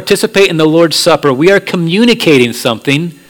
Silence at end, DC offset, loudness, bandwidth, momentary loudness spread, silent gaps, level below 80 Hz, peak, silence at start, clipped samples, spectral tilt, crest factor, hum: 0.15 s; under 0.1%; -9 LUFS; 19 kHz; 5 LU; none; -46 dBFS; 0 dBFS; 0 s; 1%; -4.5 dB/octave; 10 dB; none